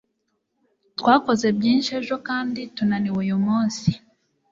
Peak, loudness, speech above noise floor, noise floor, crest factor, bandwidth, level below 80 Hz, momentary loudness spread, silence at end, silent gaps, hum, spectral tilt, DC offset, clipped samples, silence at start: -4 dBFS; -22 LUFS; 53 dB; -74 dBFS; 20 dB; 7.8 kHz; -58 dBFS; 9 LU; 0.55 s; none; none; -5.5 dB/octave; under 0.1%; under 0.1%; 1 s